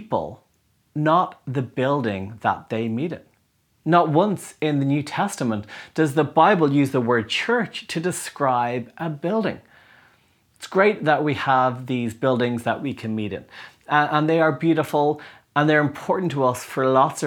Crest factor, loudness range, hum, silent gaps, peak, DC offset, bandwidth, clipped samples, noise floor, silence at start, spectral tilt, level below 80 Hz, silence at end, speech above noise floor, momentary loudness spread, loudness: 20 dB; 4 LU; none; none; -2 dBFS; under 0.1%; 19.5 kHz; under 0.1%; -65 dBFS; 0 s; -6 dB/octave; -66 dBFS; 0 s; 44 dB; 10 LU; -22 LUFS